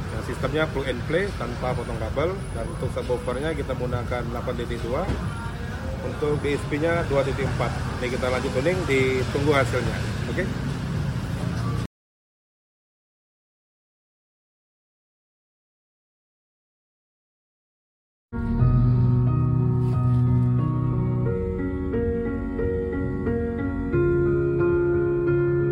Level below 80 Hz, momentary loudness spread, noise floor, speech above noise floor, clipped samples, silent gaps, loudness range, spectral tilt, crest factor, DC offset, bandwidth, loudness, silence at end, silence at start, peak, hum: -36 dBFS; 8 LU; under -90 dBFS; over 65 dB; under 0.1%; 11.86-18.29 s; 8 LU; -7.5 dB/octave; 18 dB; under 0.1%; 16 kHz; -25 LUFS; 0 s; 0 s; -6 dBFS; none